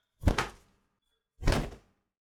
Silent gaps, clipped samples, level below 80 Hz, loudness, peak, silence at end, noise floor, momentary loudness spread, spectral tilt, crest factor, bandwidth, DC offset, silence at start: none; under 0.1%; -36 dBFS; -33 LUFS; -6 dBFS; 0.45 s; -80 dBFS; 9 LU; -5.5 dB/octave; 26 dB; 16.5 kHz; under 0.1%; 0.2 s